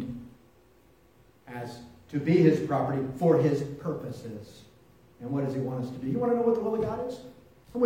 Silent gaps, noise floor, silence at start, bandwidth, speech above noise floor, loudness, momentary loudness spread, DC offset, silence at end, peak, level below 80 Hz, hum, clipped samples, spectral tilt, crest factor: none; -60 dBFS; 0 s; 16.5 kHz; 33 dB; -28 LUFS; 21 LU; under 0.1%; 0 s; -8 dBFS; -62 dBFS; none; under 0.1%; -8.5 dB/octave; 20 dB